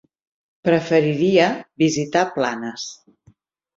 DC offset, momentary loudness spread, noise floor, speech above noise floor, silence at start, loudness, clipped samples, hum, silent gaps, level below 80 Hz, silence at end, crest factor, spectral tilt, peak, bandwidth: under 0.1%; 12 LU; -57 dBFS; 38 dB; 0.65 s; -19 LUFS; under 0.1%; none; none; -62 dBFS; 0.85 s; 18 dB; -5 dB/octave; -2 dBFS; 7.8 kHz